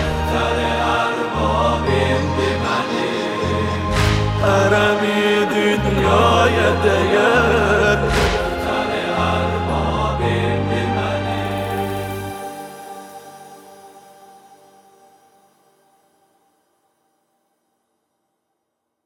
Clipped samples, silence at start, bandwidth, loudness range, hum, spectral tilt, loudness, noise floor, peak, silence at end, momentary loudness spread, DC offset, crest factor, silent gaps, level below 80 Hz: under 0.1%; 0 s; 16.5 kHz; 12 LU; none; -5.5 dB/octave; -18 LUFS; -75 dBFS; -2 dBFS; 5.05 s; 10 LU; under 0.1%; 18 dB; none; -32 dBFS